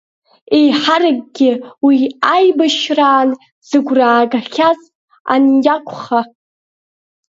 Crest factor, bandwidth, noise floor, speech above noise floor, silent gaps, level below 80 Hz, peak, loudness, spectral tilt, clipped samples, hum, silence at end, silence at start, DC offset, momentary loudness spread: 14 dB; 7.8 kHz; under -90 dBFS; over 77 dB; 3.52-3.62 s, 4.95-5.08 s, 5.20-5.25 s; -66 dBFS; 0 dBFS; -13 LUFS; -4 dB/octave; under 0.1%; none; 1.1 s; 0.5 s; under 0.1%; 7 LU